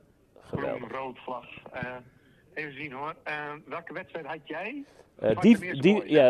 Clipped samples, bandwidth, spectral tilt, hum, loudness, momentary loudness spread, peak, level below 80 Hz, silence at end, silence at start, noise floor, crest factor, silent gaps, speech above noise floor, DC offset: under 0.1%; 12 kHz; -7 dB/octave; none; -29 LUFS; 18 LU; -8 dBFS; -64 dBFS; 0 s; 0.5 s; -56 dBFS; 20 dB; none; 29 dB; under 0.1%